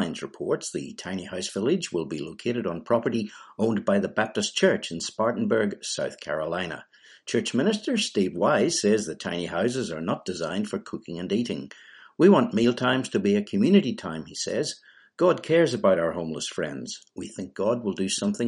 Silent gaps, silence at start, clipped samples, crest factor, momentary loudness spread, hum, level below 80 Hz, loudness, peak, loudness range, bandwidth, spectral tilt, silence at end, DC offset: none; 0 s; under 0.1%; 20 dB; 13 LU; none; -64 dBFS; -26 LUFS; -6 dBFS; 4 LU; 11.5 kHz; -4.5 dB/octave; 0 s; under 0.1%